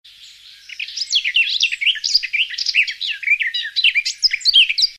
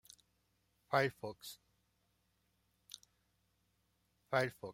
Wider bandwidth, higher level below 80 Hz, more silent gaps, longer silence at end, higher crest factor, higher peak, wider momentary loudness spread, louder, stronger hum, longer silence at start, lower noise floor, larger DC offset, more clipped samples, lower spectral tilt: about the same, 15.5 kHz vs 16.5 kHz; first, -62 dBFS vs -80 dBFS; neither; about the same, 0 s vs 0 s; second, 16 dB vs 26 dB; first, -2 dBFS vs -18 dBFS; second, 10 LU vs 20 LU; first, -15 LUFS vs -38 LUFS; about the same, 50 Hz at -70 dBFS vs 60 Hz at -80 dBFS; second, 0.2 s vs 0.9 s; second, -42 dBFS vs -79 dBFS; neither; neither; second, 6 dB/octave vs -5 dB/octave